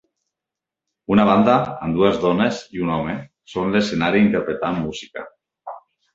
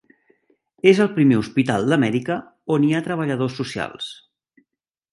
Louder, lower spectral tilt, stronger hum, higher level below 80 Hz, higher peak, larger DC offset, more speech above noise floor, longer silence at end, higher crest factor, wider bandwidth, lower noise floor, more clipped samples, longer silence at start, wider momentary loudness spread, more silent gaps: about the same, -19 LUFS vs -20 LUFS; about the same, -6.5 dB/octave vs -6.5 dB/octave; neither; first, -50 dBFS vs -60 dBFS; about the same, -2 dBFS vs -2 dBFS; neither; first, 67 dB vs 60 dB; second, 0.35 s vs 1 s; about the same, 20 dB vs 20 dB; second, 7.8 kHz vs 11.5 kHz; first, -86 dBFS vs -79 dBFS; neither; first, 1.1 s vs 0.85 s; first, 20 LU vs 12 LU; neither